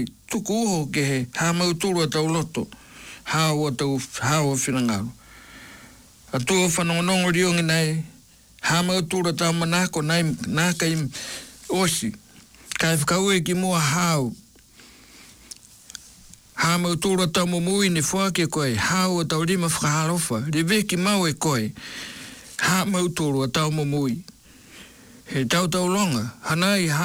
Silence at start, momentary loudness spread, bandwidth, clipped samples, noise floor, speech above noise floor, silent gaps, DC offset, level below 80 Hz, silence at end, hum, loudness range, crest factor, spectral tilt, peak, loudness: 0 s; 14 LU; 19.5 kHz; under 0.1%; -51 dBFS; 29 dB; none; under 0.1%; -54 dBFS; 0 s; none; 3 LU; 12 dB; -4 dB/octave; -12 dBFS; -22 LUFS